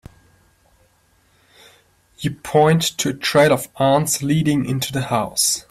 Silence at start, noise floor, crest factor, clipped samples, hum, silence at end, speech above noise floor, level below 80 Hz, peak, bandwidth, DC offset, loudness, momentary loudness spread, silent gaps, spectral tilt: 2.2 s; -59 dBFS; 16 dB; under 0.1%; none; 0.1 s; 41 dB; -52 dBFS; -4 dBFS; 15.5 kHz; under 0.1%; -18 LUFS; 7 LU; none; -4 dB/octave